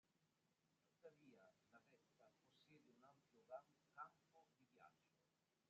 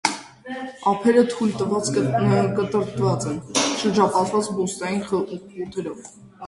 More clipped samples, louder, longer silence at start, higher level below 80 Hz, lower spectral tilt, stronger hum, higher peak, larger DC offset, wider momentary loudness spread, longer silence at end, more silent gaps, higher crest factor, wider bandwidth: neither; second, -63 LUFS vs -22 LUFS; about the same, 0.05 s vs 0.05 s; second, under -90 dBFS vs -56 dBFS; second, -3.5 dB/octave vs -5 dB/octave; neither; second, -46 dBFS vs -2 dBFS; neither; second, 7 LU vs 14 LU; about the same, 0 s vs 0 s; neither; about the same, 24 dB vs 20 dB; second, 7.2 kHz vs 11.5 kHz